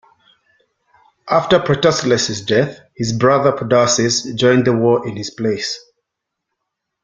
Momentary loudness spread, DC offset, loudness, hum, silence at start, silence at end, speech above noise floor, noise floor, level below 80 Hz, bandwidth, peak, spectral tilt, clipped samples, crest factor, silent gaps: 9 LU; under 0.1%; -16 LUFS; none; 1.25 s; 1.25 s; 64 dB; -79 dBFS; -52 dBFS; 9.6 kHz; -2 dBFS; -4.5 dB/octave; under 0.1%; 16 dB; none